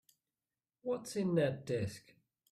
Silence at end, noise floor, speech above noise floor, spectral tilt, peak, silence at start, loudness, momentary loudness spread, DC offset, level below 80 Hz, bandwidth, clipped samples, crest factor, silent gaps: 0.5 s; under -90 dBFS; over 54 dB; -6.5 dB/octave; -20 dBFS; 0.85 s; -37 LUFS; 12 LU; under 0.1%; -72 dBFS; 14.5 kHz; under 0.1%; 18 dB; none